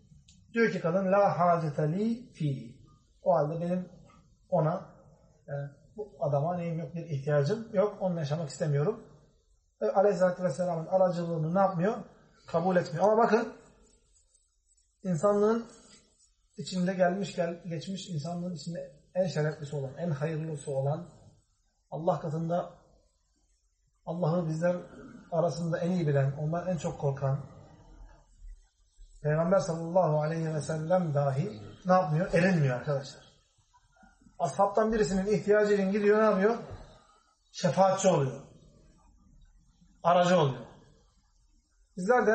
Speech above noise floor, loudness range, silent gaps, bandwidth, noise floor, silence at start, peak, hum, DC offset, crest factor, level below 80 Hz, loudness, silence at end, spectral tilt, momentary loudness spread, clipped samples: 44 dB; 7 LU; none; 8.4 kHz; -72 dBFS; 0.55 s; -10 dBFS; none; under 0.1%; 20 dB; -60 dBFS; -29 LUFS; 0 s; -7 dB/octave; 14 LU; under 0.1%